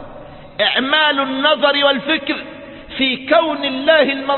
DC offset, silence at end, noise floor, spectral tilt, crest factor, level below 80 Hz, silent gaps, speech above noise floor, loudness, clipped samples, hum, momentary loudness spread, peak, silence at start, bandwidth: under 0.1%; 0 s; -36 dBFS; -8 dB/octave; 16 dB; -52 dBFS; none; 20 dB; -15 LUFS; under 0.1%; none; 17 LU; 0 dBFS; 0 s; 4.4 kHz